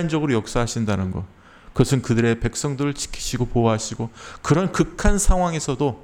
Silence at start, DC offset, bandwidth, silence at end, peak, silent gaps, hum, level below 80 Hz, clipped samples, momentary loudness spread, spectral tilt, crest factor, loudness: 0 s; under 0.1%; 16 kHz; 0.05 s; -2 dBFS; none; none; -28 dBFS; under 0.1%; 10 LU; -5.5 dB/octave; 20 dB; -22 LUFS